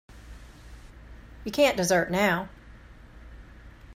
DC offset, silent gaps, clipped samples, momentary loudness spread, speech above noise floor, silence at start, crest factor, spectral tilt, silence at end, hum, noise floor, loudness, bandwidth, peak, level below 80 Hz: under 0.1%; none; under 0.1%; 26 LU; 24 dB; 0.1 s; 20 dB; -4 dB/octave; 0 s; none; -48 dBFS; -24 LUFS; 16 kHz; -10 dBFS; -48 dBFS